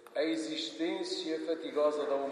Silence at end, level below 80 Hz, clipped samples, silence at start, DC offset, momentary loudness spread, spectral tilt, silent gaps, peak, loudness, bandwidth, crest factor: 0 s; under -90 dBFS; under 0.1%; 0 s; under 0.1%; 5 LU; -3 dB/octave; none; -18 dBFS; -34 LUFS; 11 kHz; 16 dB